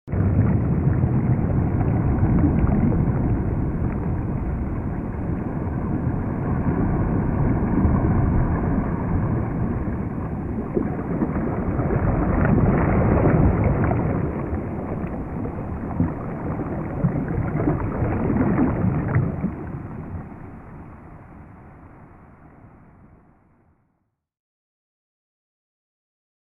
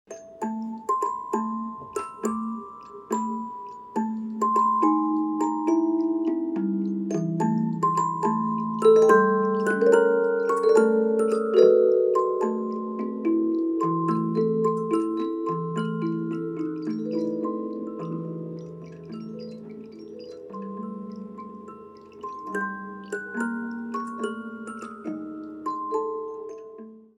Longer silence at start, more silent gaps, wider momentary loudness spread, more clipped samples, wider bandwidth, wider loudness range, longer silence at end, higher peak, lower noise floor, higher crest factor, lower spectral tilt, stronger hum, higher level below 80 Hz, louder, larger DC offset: about the same, 0.05 s vs 0.1 s; neither; second, 10 LU vs 19 LU; neither; second, 3 kHz vs 12 kHz; second, 6 LU vs 15 LU; first, 3.8 s vs 0.15 s; about the same, -4 dBFS vs -4 dBFS; first, -72 dBFS vs -45 dBFS; about the same, 18 dB vs 20 dB; first, -12.5 dB/octave vs -7 dB/octave; neither; first, -30 dBFS vs -74 dBFS; about the same, -23 LUFS vs -25 LUFS; neither